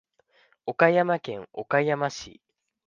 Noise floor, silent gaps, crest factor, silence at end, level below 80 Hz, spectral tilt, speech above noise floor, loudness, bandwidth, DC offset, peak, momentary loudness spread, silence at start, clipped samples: -64 dBFS; none; 22 dB; 0.55 s; -68 dBFS; -5.5 dB/octave; 39 dB; -25 LUFS; 7.4 kHz; under 0.1%; -4 dBFS; 17 LU; 0.65 s; under 0.1%